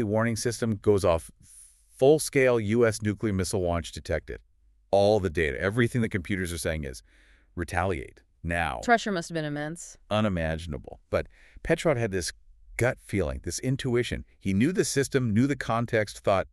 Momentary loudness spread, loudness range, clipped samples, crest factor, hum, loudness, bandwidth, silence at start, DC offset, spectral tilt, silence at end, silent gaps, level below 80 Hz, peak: 13 LU; 5 LU; under 0.1%; 18 dB; none; -27 LUFS; 13.5 kHz; 0 s; under 0.1%; -5.5 dB/octave; 0.05 s; none; -46 dBFS; -8 dBFS